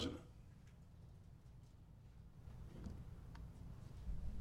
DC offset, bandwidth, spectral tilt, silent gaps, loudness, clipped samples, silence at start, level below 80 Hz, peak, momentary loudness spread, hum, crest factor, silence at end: under 0.1%; 15.5 kHz; -6 dB/octave; none; -57 LUFS; under 0.1%; 0 s; -56 dBFS; -32 dBFS; 12 LU; none; 20 dB; 0 s